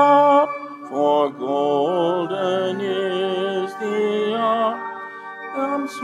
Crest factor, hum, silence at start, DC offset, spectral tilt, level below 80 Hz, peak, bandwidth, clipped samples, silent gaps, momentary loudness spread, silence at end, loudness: 16 dB; none; 0 s; under 0.1%; -5.5 dB/octave; -84 dBFS; -4 dBFS; 12 kHz; under 0.1%; none; 12 LU; 0 s; -21 LUFS